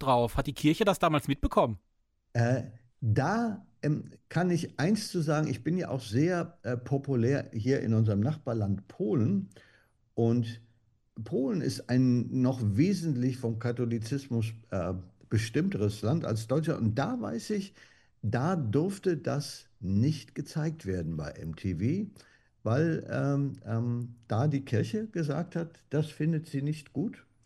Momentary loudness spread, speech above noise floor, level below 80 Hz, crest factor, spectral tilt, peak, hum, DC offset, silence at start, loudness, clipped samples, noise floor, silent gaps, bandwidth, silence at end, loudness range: 9 LU; 39 dB; -52 dBFS; 18 dB; -7 dB/octave; -12 dBFS; none; under 0.1%; 0 s; -31 LUFS; under 0.1%; -68 dBFS; none; 15 kHz; 0.25 s; 3 LU